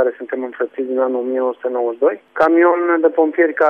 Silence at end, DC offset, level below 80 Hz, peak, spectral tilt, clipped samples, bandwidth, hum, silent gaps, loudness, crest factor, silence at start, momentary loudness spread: 0 s; under 0.1%; -66 dBFS; -2 dBFS; -6.5 dB/octave; under 0.1%; 4.8 kHz; none; none; -17 LUFS; 14 dB; 0 s; 10 LU